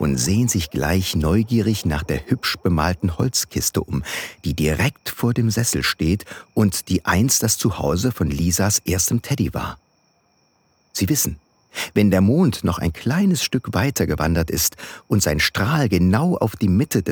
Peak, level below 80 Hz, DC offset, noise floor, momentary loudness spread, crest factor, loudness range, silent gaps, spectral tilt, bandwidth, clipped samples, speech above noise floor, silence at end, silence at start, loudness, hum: -4 dBFS; -36 dBFS; under 0.1%; -62 dBFS; 7 LU; 16 dB; 3 LU; none; -4.5 dB/octave; over 20 kHz; under 0.1%; 43 dB; 0 s; 0 s; -20 LUFS; none